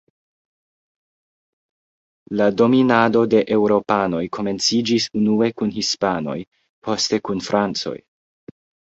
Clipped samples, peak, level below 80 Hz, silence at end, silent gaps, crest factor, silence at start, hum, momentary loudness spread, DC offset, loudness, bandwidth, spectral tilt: under 0.1%; -2 dBFS; -58 dBFS; 1 s; 6.48-6.52 s, 6.69-6.82 s; 20 dB; 2.3 s; none; 11 LU; under 0.1%; -19 LUFS; 8 kHz; -4.5 dB/octave